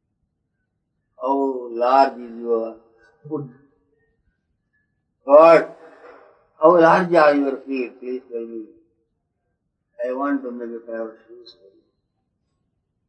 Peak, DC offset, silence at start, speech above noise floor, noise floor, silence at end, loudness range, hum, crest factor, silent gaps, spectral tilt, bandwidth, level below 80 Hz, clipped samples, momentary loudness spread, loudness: 0 dBFS; under 0.1%; 1.2 s; 56 dB; -74 dBFS; 1.75 s; 14 LU; none; 20 dB; none; -7 dB/octave; 8.8 kHz; -76 dBFS; under 0.1%; 20 LU; -17 LUFS